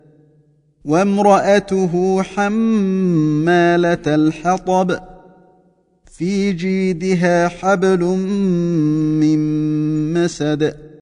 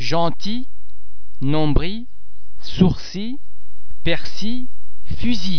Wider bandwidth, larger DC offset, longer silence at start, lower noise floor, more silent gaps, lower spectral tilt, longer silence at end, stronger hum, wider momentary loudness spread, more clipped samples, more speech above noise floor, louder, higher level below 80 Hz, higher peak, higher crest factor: first, 10.5 kHz vs 5.4 kHz; second, under 0.1% vs 20%; first, 0.85 s vs 0 s; first, -56 dBFS vs -49 dBFS; neither; about the same, -7 dB/octave vs -6.5 dB/octave; about the same, 0.05 s vs 0 s; neither; second, 6 LU vs 19 LU; neither; first, 41 dB vs 32 dB; first, -16 LUFS vs -23 LUFS; second, -48 dBFS vs -32 dBFS; about the same, 0 dBFS vs 0 dBFS; about the same, 16 dB vs 20 dB